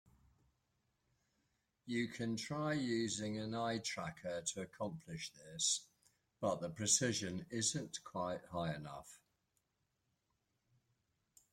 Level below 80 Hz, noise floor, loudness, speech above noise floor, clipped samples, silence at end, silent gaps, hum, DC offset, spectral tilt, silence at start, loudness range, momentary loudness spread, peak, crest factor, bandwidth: -74 dBFS; -85 dBFS; -40 LUFS; 44 dB; under 0.1%; 2.35 s; none; none; under 0.1%; -3 dB/octave; 1.85 s; 7 LU; 13 LU; -20 dBFS; 24 dB; 16.5 kHz